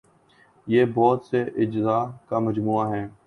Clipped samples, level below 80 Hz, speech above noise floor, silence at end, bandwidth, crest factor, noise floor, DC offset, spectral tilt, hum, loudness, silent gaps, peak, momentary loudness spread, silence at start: under 0.1%; -60 dBFS; 35 dB; 0.15 s; 6.4 kHz; 18 dB; -58 dBFS; under 0.1%; -9 dB/octave; none; -23 LUFS; none; -6 dBFS; 7 LU; 0.65 s